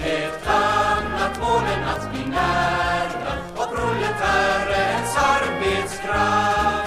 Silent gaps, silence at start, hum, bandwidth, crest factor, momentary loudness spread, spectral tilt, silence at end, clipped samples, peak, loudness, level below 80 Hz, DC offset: none; 0 s; none; 15.5 kHz; 16 dB; 7 LU; -4 dB/octave; 0 s; under 0.1%; -6 dBFS; -21 LUFS; -38 dBFS; under 0.1%